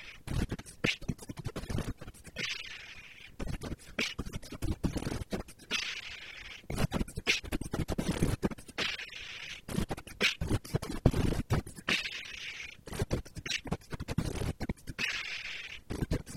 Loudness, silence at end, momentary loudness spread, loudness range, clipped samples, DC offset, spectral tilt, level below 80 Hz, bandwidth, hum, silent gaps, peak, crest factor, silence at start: -36 LUFS; 0 s; 11 LU; 5 LU; under 0.1%; under 0.1%; -4.5 dB/octave; -44 dBFS; 16.5 kHz; none; none; -10 dBFS; 26 dB; 0 s